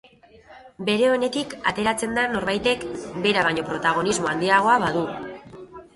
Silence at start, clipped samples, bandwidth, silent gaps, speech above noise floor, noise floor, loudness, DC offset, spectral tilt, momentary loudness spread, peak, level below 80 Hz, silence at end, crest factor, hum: 0.5 s; under 0.1%; 11.5 kHz; none; 28 dB; -50 dBFS; -22 LUFS; under 0.1%; -4 dB/octave; 13 LU; -4 dBFS; -54 dBFS; 0.15 s; 18 dB; none